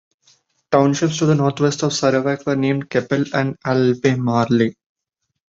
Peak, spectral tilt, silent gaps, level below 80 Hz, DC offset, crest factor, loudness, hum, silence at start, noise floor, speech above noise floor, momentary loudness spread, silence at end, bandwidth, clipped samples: -2 dBFS; -6 dB/octave; none; -58 dBFS; under 0.1%; 16 dB; -18 LUFS; none; 0.7 s; -58 dBFS; 41 dB; 4 LU; 0.75 s; 7.8 kHz; under 0.1%